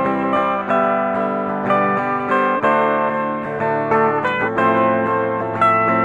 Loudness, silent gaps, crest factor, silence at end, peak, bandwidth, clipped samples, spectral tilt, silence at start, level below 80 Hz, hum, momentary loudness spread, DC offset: -17 LUFS; none; 14 dB; 0 s; -4 dBFS; 9.4 kHz; under 0.1%; -7.5 dB/octave; 0 s; -56 dBFS; none; 5 LU; under 0.1%